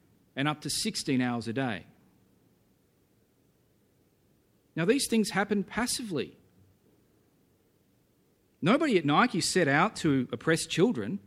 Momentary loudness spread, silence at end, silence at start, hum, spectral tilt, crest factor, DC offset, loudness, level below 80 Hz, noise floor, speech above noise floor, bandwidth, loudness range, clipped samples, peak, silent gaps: 10 LU; 0.05 s; 0.35 s; none; -4.5 dB/octave; 20 dB; under 0.1%; -28 LUFS; -66 dBFS; -68 dBFS; 40 dB; 15.5 kHz; 10 LU; under 0.1%; -10 dBFS; none